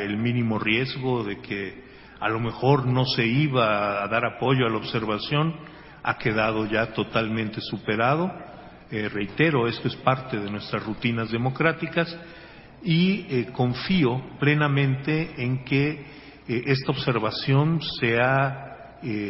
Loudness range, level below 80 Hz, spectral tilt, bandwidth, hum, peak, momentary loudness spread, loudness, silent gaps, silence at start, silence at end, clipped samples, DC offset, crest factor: 3 LU; -54 dBFS; -10.5 dB/octave; 5.8 kHz; none; -4 dBFS; 10 LU; -24 LUFS; none; 0 s; 0 s; under 0.1%; under 0.1%; 20 dB